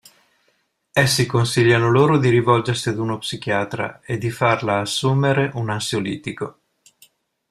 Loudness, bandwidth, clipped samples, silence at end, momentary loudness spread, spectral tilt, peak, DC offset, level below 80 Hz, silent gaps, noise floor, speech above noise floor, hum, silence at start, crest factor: -19 LUFS; 14.5 kHz; under 0.1%; 1 s; 11 LU; -5.5 dB/octave; -2 dBFS; under 0.1%; -54 dBFS; none; -66 dBFS; 48 dB; none; 0.95 s; 18 dB